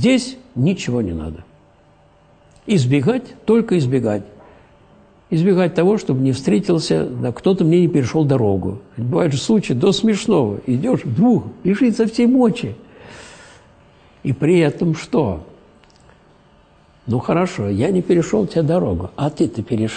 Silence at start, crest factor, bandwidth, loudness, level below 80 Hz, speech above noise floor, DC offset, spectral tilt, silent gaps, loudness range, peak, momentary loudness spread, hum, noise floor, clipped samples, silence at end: 0 s; 14 dB; 9.4 kHz; -18 LUFS; -46 dBFS; 35 dB; under 0.1%; -7 dB/octave; none; 5 LU; -2 dBFS; 11 LU; none; -51 dBFS; under 0.1%; 0 s